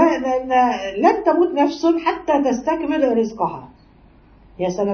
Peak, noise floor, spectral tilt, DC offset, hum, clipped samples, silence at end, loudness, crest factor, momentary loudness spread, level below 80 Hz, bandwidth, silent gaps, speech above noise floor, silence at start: -2 dBFS; -49 dBFS; -5.5 dB/octave; under 0.1%; none; under 0.1%; 0 s; -19 LUFS; 16 dB; 8 LU; -50 dBFS; 6.6 kHz; none; 31 dB; 0 s